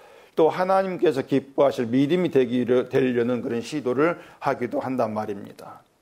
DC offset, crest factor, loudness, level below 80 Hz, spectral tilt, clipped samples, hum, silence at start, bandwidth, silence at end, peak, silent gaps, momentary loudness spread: under 0.1%; 16 dB; -23 LUFS; -66 dBFS; -7 dB/octave; under 0.1%; none; 0.35 s; 15 kHz; 0.25 s; -8 dBFS; none; 9 LU